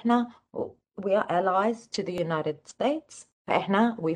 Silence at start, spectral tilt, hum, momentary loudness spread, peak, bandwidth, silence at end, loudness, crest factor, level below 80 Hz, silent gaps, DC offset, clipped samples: 0.05 s; -6 dB/octave; none; 12 LU; -10 dBFS; 10 kHz; 0 s; -28 LUFS; 18 dB; -70 dBFS; 3.32-3.45 s; under 0.1%; under 0.1%